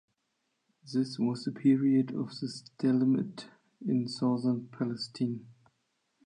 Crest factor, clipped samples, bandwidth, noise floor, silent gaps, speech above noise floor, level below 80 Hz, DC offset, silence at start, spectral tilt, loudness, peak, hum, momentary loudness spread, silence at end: 16 dB; under 0.1%; 10 kHz; -80 dBFS; none; 50 dB; -80 dBFS; under 0.1%; 0.85 s; -7 dB/octave; -31 LUFS; -14 dBFS; none; 13 LU; 0.75 s